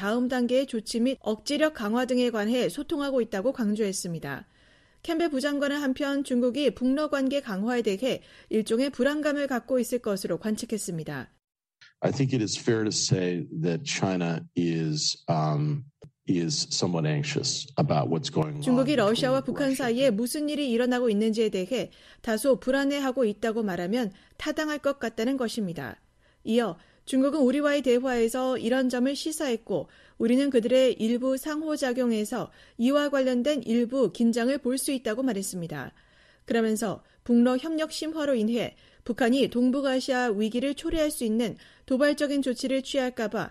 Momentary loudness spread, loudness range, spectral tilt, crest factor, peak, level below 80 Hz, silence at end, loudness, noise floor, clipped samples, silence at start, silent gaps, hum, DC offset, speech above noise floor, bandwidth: 8 LU; 3 LU; -5 dB/octave; 18 dB; -8 dBFS; -58 dBFS; 0 s; -27 LUFS; -60 dBFS; under 0.1%; 0 s; none; none; under 0.1%; 33 dB; 13.5 kHz